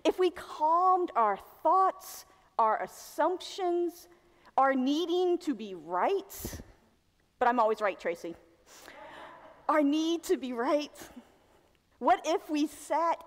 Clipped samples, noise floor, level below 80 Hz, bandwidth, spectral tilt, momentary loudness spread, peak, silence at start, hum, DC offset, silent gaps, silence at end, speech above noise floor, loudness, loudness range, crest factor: under 0.1%; -69 dBFS; -64 dBFS; 16 kHz; -4 dB/octave; 19 LU; -14 dBFS; 0.05 s; none; under 0.1%; none; 0.05 s; 40 dB; -30 LUFS; 4 LU; 16 dB